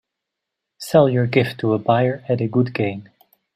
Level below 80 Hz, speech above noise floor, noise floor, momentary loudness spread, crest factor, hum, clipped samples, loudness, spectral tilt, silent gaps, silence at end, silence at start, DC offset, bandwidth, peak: -60 dBFS; 64 dB; -82 dBFS; 9 LU; 18 dB; none; under 0.1%; -19 LUFS; -7.5 dB/octave; none; 0.55 s; 0.8 s; under 0.1%; 15 kHz; -2 dBFS